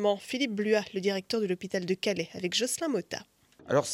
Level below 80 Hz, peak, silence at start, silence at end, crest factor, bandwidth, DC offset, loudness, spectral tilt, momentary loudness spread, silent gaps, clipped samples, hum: -72 dBFS; -12 dBFS; 0 s; 0 s; 18 dB; 16.5 kHz; under 0.1%; -30 LUFS; -4 dB/octave; 5 LU; none; under 0.1%; none